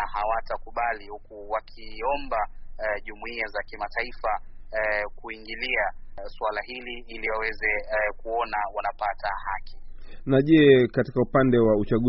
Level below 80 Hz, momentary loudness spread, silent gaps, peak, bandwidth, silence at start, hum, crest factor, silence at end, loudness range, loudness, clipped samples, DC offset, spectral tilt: -40 dBFS; 16 LU; none; -6 dBFS; 5.8 kHz; 0 s; none; 20 dB; 0 s; 8 LU; -26 LUFS; under 0.1%; under 0.1%; -4.5 dB/octave